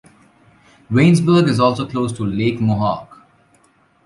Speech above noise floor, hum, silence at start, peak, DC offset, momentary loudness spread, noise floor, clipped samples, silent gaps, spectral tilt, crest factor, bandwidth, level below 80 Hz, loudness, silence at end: 41 dB; none; 0.9 s; -2 dBFS; under 0.1%; 9 LU; -56 dBFS; under 0.1%; none; -7 dB/octave; 16 dB; 11.5 kHz; -48 dBFS; -17 LUFS; 0.9 s